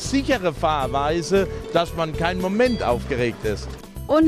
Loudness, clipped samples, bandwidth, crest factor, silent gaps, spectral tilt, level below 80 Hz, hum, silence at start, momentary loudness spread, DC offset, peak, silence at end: -22 LUFS; under 0.1%; 15.5 kHz; 18 dB; none; -5.5 dB/octave; -36 dBFS; none; 0 s; 7 LU; under 0.1%; -4 dBFS; 0 s